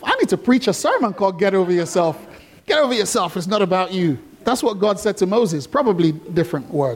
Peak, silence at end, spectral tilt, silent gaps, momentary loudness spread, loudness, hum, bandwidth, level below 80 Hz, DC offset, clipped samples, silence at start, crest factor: -4 dBFS; 0 s; -5 dB/octave; none; 5 LU; -19 LUFS; none; 17 kHz; -56 dBFS; under 0.1%; under 0.1%; 0 s; 14 dB